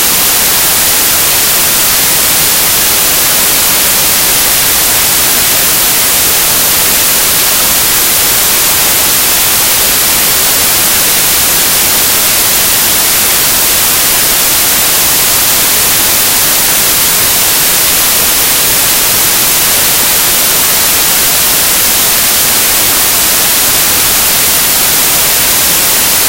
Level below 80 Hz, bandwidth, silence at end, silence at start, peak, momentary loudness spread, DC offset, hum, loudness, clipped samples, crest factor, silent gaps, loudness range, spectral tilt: -32 dBFS; over 20 kHz; 0 s; 0 s; 0 dBFS; 0 LU; under 0.1%; none; -5 LUFS; 0.7%; 8 dB; none; 0 LU; 0 dB/octave